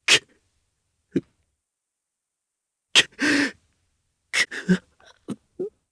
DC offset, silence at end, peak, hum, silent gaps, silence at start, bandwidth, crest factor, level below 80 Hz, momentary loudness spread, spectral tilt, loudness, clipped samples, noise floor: under 0.1%; 0.2 s; -2 dBFS; none; none; 0.1 s; 11 kHz; 24 dB; -64 dBFS; 18 LU; -2.5 dB/octave; -22 LUFS; under 0.1%; -83 dBFS